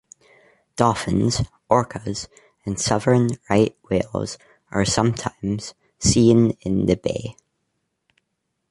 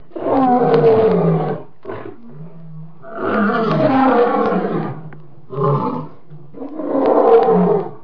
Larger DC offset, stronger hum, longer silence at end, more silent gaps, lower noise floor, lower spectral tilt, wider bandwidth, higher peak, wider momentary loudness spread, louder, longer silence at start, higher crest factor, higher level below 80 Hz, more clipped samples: second, under 0.1% vs 2%; neither; first, 1.4 s vs 0.05 s; neither; first, -76 dBFS vs -40 dBFS; second, -5.5 dB/octave vs -10 dB/octave; first, 11.5 kHz vs 5.4 kHz; about the same, 0 dBFS vs 0 dBFS; second, 15 LU vs 22 LU; second, -21 LUFS vs -15 LUFS; first, 0.75 s vs 0.15 s; first, 22 dB vs 16 dB; first, -44 dBFS vs -52 dBFS; neither